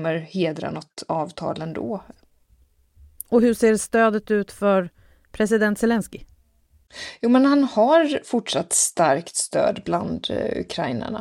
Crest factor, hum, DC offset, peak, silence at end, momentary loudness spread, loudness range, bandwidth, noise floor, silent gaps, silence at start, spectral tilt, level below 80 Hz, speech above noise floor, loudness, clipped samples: 18 dB; none; under 0.1%; -6 dBFS; 0 s; 13 LU; 5 LU; 16.5 kHz; -60 dBFS; none; 0 s; -4 dB/octave; -54 dBFS; 38 dB; -21 LUFS; under 0.1%